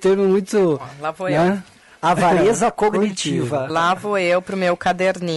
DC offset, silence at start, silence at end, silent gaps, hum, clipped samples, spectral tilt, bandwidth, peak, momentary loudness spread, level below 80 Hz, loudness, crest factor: under 0.1%; 0 s; 0 s; none; none; under 0.1%; -5.5 dB/octave; 12 kHz; -8 dBFS; 6 LU; -50 dBFS; -19 LUFS; 10 dB